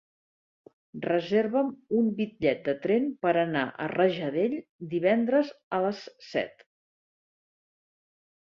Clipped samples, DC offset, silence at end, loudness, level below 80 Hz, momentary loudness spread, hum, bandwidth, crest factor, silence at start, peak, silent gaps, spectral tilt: under 0.1%; under 0.1%; 1.95 s; -28 LUFS; -70 dBFS; 8 LU; none; 7 kHz; 18 dB; 0.95 s; -10 dBFS; 4.69-4.79 s, 5.63-5.71 s; -7.5 dB/octave